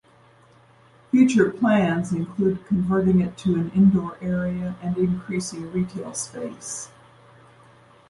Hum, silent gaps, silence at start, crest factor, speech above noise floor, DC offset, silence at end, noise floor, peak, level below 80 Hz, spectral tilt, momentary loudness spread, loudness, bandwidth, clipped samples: none; none; 1.15 s; 18 dB; 33 dB; under 0.1%; 1.25 s; -54 dBFS; -6 dBFS; -52 dBFS; -6.5 dB/octave; 13 LU; -23 LUFS; 11.5 kHz; under 0.1%